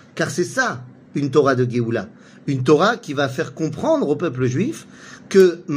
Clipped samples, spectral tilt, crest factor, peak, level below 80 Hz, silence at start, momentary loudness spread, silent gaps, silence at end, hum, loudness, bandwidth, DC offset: under 0.1%; -6 dB/octave; 18 dB; 0 dBFS; -60 dBFS; 0.15 s; 14 LU; none; 0 s; none; -19 LUFS; 15.5 kHz; under 0.1%